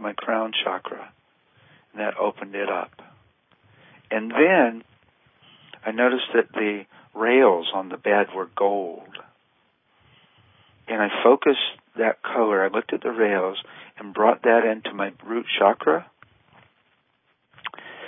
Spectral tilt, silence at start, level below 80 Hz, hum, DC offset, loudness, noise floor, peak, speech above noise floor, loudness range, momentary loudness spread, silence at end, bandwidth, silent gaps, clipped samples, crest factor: -9 dB/octave; 0 s; -78 dBFS; none; under 0.1%; -22 LUFS; -68 dBFS; -2 dBFS; 46 dB; 6 LU; 19 LU; 0 s; 3.9 kHz; none; under 0.1%; 22 dB